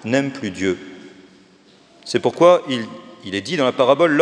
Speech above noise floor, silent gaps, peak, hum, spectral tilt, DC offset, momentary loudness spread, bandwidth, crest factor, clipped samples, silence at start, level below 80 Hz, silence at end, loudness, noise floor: 34 dB; none; 0 dBFS; none; -5 dB/octave; under 0.1%; 19 LU; 10 kHz; 18 dB; under 0.1%; 0.05 s; -66 dBFS; 0 s; -18 LUFS; -51 dBFS